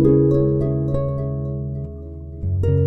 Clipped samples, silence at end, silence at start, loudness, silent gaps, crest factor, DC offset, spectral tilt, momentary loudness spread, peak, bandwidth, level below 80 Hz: under 0.1%; 0 s; 0 s; -21 LUFS; none; 16 dB; under 0.1%; -12 dB/octave; 16 LU; -4 dBFS; 4 kHz; -34 dBFS